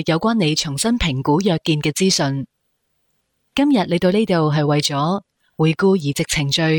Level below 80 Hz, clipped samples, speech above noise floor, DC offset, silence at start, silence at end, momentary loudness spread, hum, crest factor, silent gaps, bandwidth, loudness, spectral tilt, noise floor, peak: -42 dBFS; under 0.1%; 52 dB; under 0.1%; 0 s; 0 s; 5 LU; none; 12 dB; none; 18 kHz; -18 LUFS; -5 dB/octave; -70 dBFS; -6 dBFS